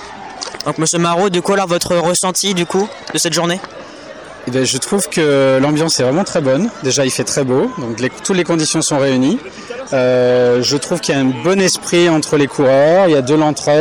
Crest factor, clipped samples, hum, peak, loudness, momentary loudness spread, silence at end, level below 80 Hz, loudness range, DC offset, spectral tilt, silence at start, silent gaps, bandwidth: 10 dB; under 0.1%; none; -4 dBFS; -14 LUFS; 10 LU; 0 s; -52 dBFS; 4 LU; under 0.1%; -4 dB/octave; 0 s; none; 19 kHz